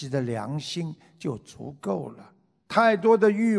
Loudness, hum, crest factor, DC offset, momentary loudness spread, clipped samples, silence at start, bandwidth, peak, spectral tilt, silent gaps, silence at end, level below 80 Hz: -25 LUFS; none; 20 dB; under 0.1%; 17 LU; under 0.1%; 0 s; 11 kHz; -6 dBFS; -6.5 dB/octave; none; 0 s; -68 dBFS